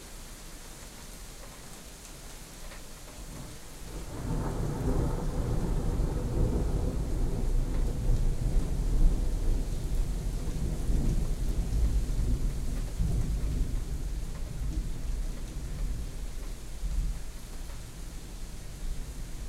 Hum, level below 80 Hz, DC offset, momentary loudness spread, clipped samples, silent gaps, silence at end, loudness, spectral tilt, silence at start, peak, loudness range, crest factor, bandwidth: none; -32 dBFS; under 0.1%; 14 LU; under 0.1%; none; 0 s; -35 LUFS; -6 dB/octave; 0 s; -12 dBFS; 9 LU; 18 dB; 15 kHz